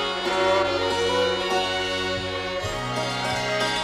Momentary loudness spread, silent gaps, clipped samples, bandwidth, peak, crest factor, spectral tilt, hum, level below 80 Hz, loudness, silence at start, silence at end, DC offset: 6 LU; none; under 0.1%; 15.5 kHz; -10 dBFS; 14 dB; -3.5 dB/octave; none; -48 dBFS; -24 LUFS; 0 s; 0 s; under 0.1%